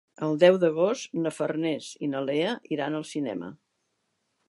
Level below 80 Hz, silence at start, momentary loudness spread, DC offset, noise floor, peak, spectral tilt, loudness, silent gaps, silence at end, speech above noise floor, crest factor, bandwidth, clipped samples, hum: -78 dBFS; 0.2 s; 12 LU; under 0.1%; -77 dBFS; -6 dBFS; -5.5 dB/octave; -26 LUFS; none; 0.95 s; 51 dB; 22 dB; 11.5 kHz; under 0.1%; none